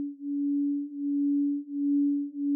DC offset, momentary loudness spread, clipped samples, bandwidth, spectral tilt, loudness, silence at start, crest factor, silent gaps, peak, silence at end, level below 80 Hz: under 0.1%; 5 LU; under 0.1%; 0.6 kHz; -14.5 dB/octave; -29 LUFS; 0 s; 8 dB; none; -20 dBFS; 0 s; under -90 dBFS